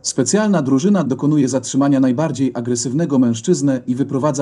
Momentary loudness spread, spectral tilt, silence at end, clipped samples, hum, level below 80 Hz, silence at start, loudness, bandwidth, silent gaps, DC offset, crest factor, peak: 4 LU; -5.5 dB/octave; 0 s; under 0.1%; none; -60 dBFS; 0.05 s; -17 LUFS; 11 kHz; none; under 0.1%; 14 dB; -2 dBFS